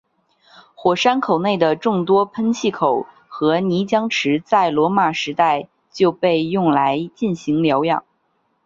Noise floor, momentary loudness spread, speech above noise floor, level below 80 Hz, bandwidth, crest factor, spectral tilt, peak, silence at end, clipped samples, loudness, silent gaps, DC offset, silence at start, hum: -66 dBFS; 6 LU; 49 dB; -62 dBFS; 7.6 kHz; 16 dB; -6 dB/octave; -2 dBFS; 0.65 s; under 0.1%; -18 LUFS; none; under 0.1%; 0.8 s; none